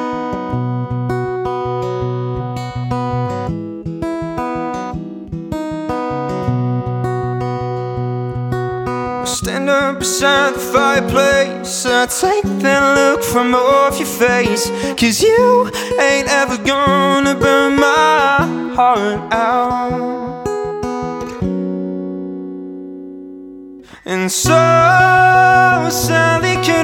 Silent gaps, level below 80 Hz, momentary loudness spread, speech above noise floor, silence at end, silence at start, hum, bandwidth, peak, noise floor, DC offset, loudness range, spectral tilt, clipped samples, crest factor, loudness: none; -40 dBFS; 13 LU; 23 dB; 0 s; 0 s; none; 18 kHz; 0 dBFS; -36 dBFS; under 0.1%; 10 LU; -4.5 dB/octave; under 0.1%; 16 dB; -15 LUFS